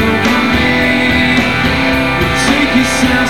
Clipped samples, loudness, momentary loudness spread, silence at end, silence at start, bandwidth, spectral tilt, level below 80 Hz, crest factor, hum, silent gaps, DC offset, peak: under 0.1%; -11 LUFS; 2 LU; 0 s; 0 s; 18.5 kHz; -4.5 dB/octave; -28 dBFS; 12 dB; none; none; 2%; 0 dBFS